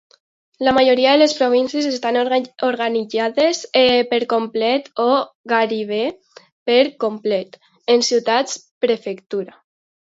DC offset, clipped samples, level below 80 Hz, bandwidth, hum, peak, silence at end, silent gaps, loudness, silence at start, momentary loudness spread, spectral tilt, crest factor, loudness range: under 0.1%; under 0.1%; -62 dBFS; 8 kHz; none; -2 dBFS; 0.6 s; 5.35-5.44 s, 6.52-6.66 s, 8.71-8.81 s; -18 LUFS; 0.6 s; 12 LU; -3 dB/octave; 16 dB; 3 LU